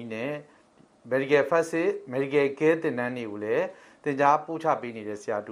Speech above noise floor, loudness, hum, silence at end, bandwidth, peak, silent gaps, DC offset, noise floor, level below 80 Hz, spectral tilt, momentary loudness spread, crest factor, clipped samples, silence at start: 32 dB; -27 LUFS; none; 0 s; 12 kHz; -8 dBFS; none; under 0.1%; -59 dBFS; -74 dBFS; -6 dB/octave; 12 LU; 20 dB; under 0.1%; 0 s